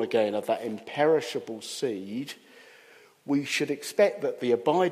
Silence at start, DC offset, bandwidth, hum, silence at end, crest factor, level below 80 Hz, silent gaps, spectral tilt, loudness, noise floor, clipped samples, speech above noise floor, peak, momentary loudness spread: 0 s; under 0.1%; 15.5 kHz; none; 0 s; 18 dB; -80 dBFS; none; -4.5 dB/octave; -28 LUFS; -55 dBFS; under 0.1%; 29 dB; -10 dBFS; 12 LU